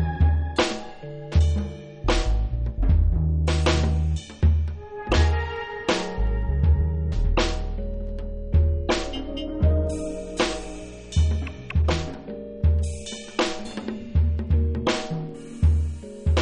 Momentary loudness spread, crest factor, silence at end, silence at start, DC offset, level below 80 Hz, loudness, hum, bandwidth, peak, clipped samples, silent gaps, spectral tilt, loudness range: 11 LU; 16 dB; 0 s; 0 s; under 0.1%; -26 dBFS; -25 LUFS; none; 9.8 kHz; -8 dBFS; under 0.1%; none; -6 dB/octave; 3 LU